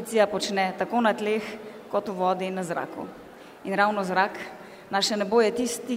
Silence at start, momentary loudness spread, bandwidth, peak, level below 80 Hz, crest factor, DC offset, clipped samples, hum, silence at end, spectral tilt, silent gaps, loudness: 0 s; 17 LU; 16 kHz; -8 dBFS; -68 dBFS; 18 dB; under 0.1%; under 0.1%; none; 0 s; -4 dB/octave; none; -26 LUFS